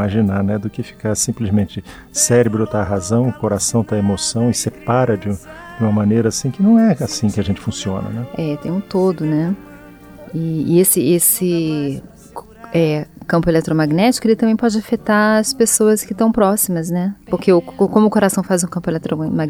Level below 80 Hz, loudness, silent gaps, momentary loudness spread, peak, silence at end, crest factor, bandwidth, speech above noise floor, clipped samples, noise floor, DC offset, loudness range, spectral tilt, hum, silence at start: -46 dBFS; -16 LUFS; none; 11 LU; -2 dBFS; 0 s; 16 dB; 17 kHz; 23 dB; under 0.1%; -39 dBFS; under 0.1%; 3 LU; -5 dB/octave; none; 0 s